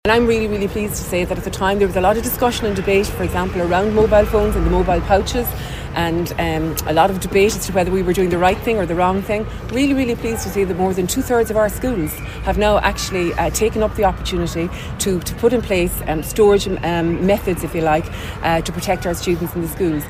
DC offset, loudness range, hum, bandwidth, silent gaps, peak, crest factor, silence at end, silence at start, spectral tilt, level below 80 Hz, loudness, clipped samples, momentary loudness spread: under 0.1%; 2 LU; none; 15.5 kHz; none; 0 dBFS; 16 dB; 0 s; 0.05 s; -5 dB/octave; -30 dBFS; -18 LUFS; under 0.1%; 7 LU